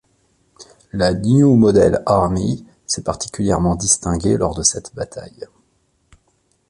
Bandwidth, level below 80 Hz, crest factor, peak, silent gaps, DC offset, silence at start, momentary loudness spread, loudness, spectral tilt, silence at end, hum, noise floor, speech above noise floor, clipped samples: 11.5 kHz; -38 dBFS; 16 dB; -2 dBFS; none; under 0.1%; 0.6 s; 17 LU; -16 LUFS; -5 dB/octave; 1.25 s; none; -63 dBFS; 47 dB; under 0.1%